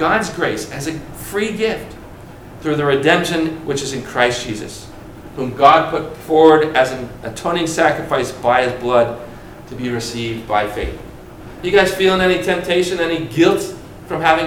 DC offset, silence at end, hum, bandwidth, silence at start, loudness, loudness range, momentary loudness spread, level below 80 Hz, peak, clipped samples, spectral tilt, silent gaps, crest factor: under 0.1%; 0 s; none; 17.5 kHz; 0 s; -17 LUFS; 5 LU; 21 LU; -42 dBFS; 0 dBFS; under 0.1%; -4.5 dB/octave; none; 18 dB